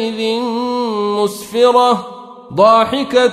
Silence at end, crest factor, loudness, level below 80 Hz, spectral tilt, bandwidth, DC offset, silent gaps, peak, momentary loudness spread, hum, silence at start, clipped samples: 0 s; 14 dB; -14 LUFS; -56 dBFS; -4.5 dB/octave; 15 kHz; under 0.1%; none; 0 dBFS; 10 LU; none; 0 s; under 0.1%